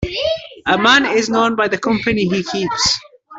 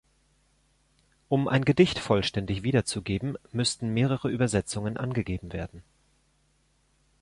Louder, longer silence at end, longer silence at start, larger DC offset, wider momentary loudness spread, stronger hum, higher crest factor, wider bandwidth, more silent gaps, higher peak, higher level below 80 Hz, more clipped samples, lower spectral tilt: first, -16 LUFS vs -27 LUFS; second, 0 s vs 1.4 s; second, 0 s vs 1.3 s; neither; about the same, 9 LU vs 10 LU; neither; second, 14 dB vs 20 dB; second, 8.4 kHz vs 11.5 kHz; neither; first, -2 dBFS vs -8 dBFS; first, -42 dBFS vs -50 dBFS; neither; second, -3.5 dB/octave vs -5.5 dB/octave